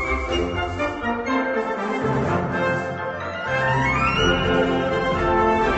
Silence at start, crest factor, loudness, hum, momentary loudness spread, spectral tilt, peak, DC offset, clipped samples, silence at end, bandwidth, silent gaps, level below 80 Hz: 0 s; 16 dB; -22 LUFS; none; 6 LU; -6 dB/octave; -6 dBFS; under 0.1%; under 0.1%; 0 s; 8.4 kHz; none; -36 dBFS